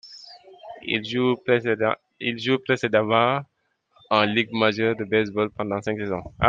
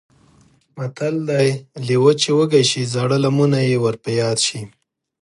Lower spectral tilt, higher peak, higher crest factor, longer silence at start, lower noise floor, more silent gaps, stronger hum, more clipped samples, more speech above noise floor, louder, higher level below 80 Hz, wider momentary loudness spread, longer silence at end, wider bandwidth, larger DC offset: about the same, -6 dB/octave vs -5 dB/octave; about the same, -2 dBFS vs -2 dBFS; first, 22 dB vs 16 dB; second, 0.05 s vs 0.75 s; first, -62 dBFS vs -54 dBFS; neither; neither; neither; about the same, 40 dB vs 37 dB; second, -23 LUFS vs -17 LUFS; first, -52 dBFS vs -62 dBFS; second, 9 LU vs 12 LU; second, 0 s vs 0.55 s; second, 7.6 kHz vs 11.5 kHz; neither